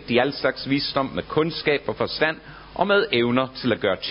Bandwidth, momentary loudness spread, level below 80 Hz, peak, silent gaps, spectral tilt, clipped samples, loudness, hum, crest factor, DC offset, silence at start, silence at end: 5.6 kHz; 6 LU; -50 dBFS; -4 dBFS; none; -9.5 dB/octave; under 0.1%; -23 LUFS; none; 18 dB; under 0.1%; 0 s; 0 s